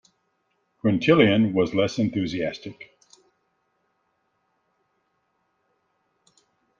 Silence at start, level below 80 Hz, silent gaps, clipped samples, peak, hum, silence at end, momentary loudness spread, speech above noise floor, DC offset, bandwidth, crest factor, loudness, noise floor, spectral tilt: 0.85 s; -62 dBFS; none; under 0.1%; -4 dBFS; none; 3.95 s; 13 LU; 51 dB; under 0.1%; 7.4 kHz; 24 dB; -22 LUFS; -72 dBFS; -6.5 dB/octave